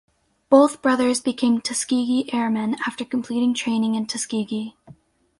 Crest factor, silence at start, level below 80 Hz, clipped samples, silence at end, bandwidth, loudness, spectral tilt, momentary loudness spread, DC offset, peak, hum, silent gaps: 20 dB; 0.5 s; -64 dBFS; under 0.1%; 0.5 s; 11.5 kHz; -21 LUFS; -4 dB/octave; 10 LU; under 0.1%; -2 dBFS; none; none